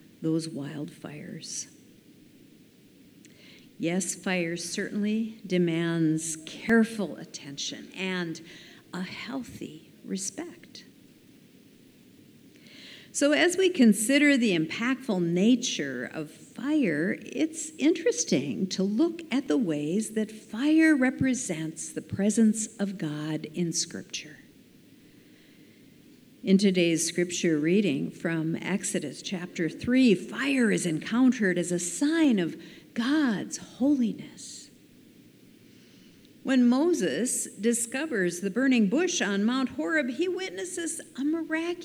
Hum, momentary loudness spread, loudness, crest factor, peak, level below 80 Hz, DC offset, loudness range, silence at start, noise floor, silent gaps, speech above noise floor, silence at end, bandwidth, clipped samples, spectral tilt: none; 15 LU; -27 LUFS; 18 dB; -10 dBFS; -68 dBFS; under 0.1%; 11 LU; 0.2 s; -56 dBFS; none; 29 dB; 0 s; 16 kHz; under 0.1%; -4.5 dB/octave